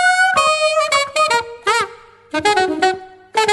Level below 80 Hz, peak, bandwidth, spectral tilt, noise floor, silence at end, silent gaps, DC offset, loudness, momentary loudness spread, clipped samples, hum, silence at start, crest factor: -56 dBFS; -2 dBFS; 12 kHz; -1.5 dB/octave; -37 dBFS; 0 s; none; under 0.1%; -16 LUFS; 10 LU; under 0.1%; none; 0 s; 16 dB